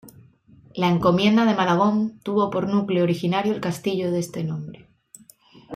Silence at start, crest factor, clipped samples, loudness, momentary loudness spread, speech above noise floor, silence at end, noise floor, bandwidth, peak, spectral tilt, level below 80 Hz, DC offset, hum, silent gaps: 0.05 s; 18 dB; under 0.1%; -22 LUFS; 11 LU; 31 dB; 0 s; -52 dBFS; 15.5 kHz; -6 dBFS; -6.5 dB/octave; -58 dBFS; under 0.1%; none; none